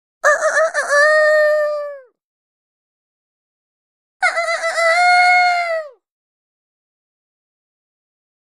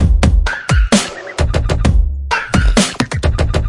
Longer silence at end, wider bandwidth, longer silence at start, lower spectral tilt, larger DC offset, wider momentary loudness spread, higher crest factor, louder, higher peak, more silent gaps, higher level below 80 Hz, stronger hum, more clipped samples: first, 2.65 s vs 0 s; first, 13.5 kHz vs 11.5 kHz; first, 0.25 s vs 0 s; second, 3 dB/octave vs -5 dB/octave; first, 0.1% vs under 0.1%; first, 11 LU vs 5 LU; about the same, 16 dB vs 12 dB; about the same, -14 LUFS vs -15 LUFS; about the same, -2 dBFS vs 0 dBFS; first, 2.24-4.20 s vs none; second, -76 dBFS vs -16 dBFS; neither; neither